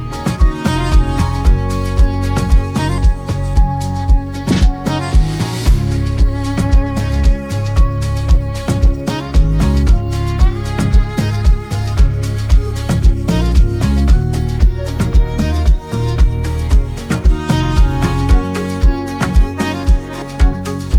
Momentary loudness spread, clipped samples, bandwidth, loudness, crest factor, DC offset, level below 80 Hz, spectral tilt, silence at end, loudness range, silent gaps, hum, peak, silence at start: 4 LU; under 0.1%; 13 kHz; -16 LUFS; 12 dB; under 0.1%; -14 dBFS; -6.5 dB/octave; 0 s; 1 LU; none; none; -2 dBFS; 0 s